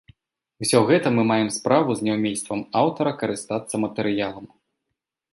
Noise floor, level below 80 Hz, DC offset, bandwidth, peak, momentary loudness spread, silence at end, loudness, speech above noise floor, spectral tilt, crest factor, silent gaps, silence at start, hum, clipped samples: -82 dBFS; -62 dBFS; under 0.1%; 12 kHz; -4 dBFS; 9 LU; 0.85 s; -22 LUFS; 60 dB; -5 dB/octave; 20 dB; none; 0.6 s; none; under 0.1%